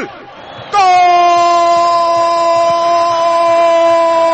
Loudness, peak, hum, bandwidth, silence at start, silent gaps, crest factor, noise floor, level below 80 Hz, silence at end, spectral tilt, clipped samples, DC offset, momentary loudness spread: -10 LUFS; -2 dBFS; none; 8.6 kHz; 0 s; none; 8 dB; -31 dBFS; -54 dBFS; 0 s; -3 dB/octave; under 0.1%; under 0.1%; 3 LU